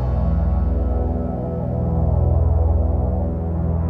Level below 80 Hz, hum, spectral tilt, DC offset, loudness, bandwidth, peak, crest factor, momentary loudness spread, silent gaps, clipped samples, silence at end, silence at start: -22 dBFS; none; -12.5 dB/octave; under 0.1%; -21 LUFS; 2.3 kHz; -8 dBFS; 10 dB; 5 LU; none; under 0.1%; 0 s; 0 s